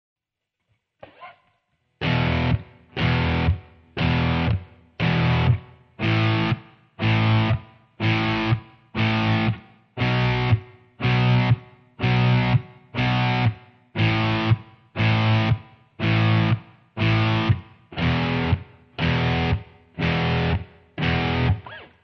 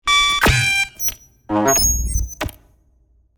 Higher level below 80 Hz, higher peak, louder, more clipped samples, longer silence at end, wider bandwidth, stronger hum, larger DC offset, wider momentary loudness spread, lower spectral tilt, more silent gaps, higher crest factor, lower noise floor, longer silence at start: second, -40 dBFS vs -28 dBFS; second, -8 dBFS vs -2 dBFS; second, -23 LUFS vs -16 LUFS; neither; second, 0.2 s vs 0.85 s; second, 6.2 kHz vs over 20 kHz; neither; neither; about the same, 10 LU vs 12 LU; first, -8 dB/octave vs -2 dB/octave; neither; about the same, 16 dB vs 18 dB; first, -82 dBFS vs -57 dBFS; first, 1.2 s vs 0.05 s